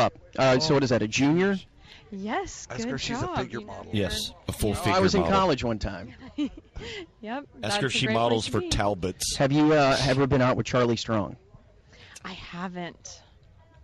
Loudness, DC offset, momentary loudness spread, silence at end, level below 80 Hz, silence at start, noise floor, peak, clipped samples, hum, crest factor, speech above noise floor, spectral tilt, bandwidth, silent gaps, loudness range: -25 LUFS; under 0.1%; 17 LU; 0.65 s; -46 dBFS; 0 s; -55 dBFS; -8 dBFS; under 0.1%; none; 18 dB; 29 dB; -5 dB/octave; 14 kHz; none; 6 LU